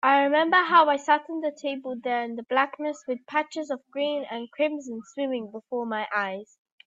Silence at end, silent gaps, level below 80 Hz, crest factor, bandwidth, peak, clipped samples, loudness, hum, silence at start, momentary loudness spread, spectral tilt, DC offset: 0.4 s; none; -80 dBFS; 20 dB; 7.8 kHz; -6 dBFS; under 0.1%; -26 LUFS; none; 0.05 s; 14 LU; -3.5 dB/octave; under 0.1%